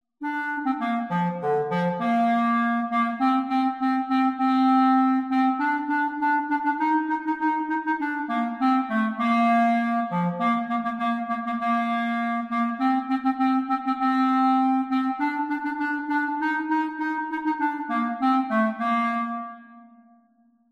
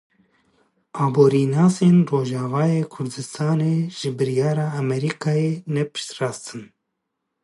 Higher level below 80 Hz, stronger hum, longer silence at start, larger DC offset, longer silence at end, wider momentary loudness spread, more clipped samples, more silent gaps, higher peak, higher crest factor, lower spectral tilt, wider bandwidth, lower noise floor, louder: second, -72 dBFS vs -66 dBFS; neither; second, 0.2 s vs 0.95 s; neither; about the same, 0.9 s vs 0.8 s; second, 6 LU vs 12 LU; neither; neither; second, -10 dBFS vs -4 dBFS; about the same, 14 dB vs 18 dB; about the same, -7.5 dB/octave vs -7 dB/octave; second, 7 kHz vs 11.5 kHz; second, -62 dBFS vs -78 dBFS; second, -24 LUFS vs -21 LUFS